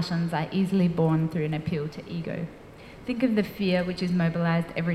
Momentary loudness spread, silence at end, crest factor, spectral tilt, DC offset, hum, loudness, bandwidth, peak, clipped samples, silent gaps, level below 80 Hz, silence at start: 11 LU; 0 s; 14 dB; -8 dB/octave; under 0.1%; none; -27 LUFS; 14 kHz; -12 dBFS; under 0.1%; none; -54 dBFS; 0 s